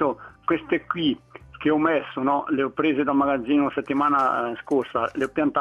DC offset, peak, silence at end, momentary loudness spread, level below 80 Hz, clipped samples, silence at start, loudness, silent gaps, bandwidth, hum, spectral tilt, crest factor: under 0.1%; -6 dBFS; 0 s; 5 LU; -58 dBFS; under 0.1%; 0 s; -23 LUFS; none; 7.4 kHz; none; -7 dB/octave; 16 dB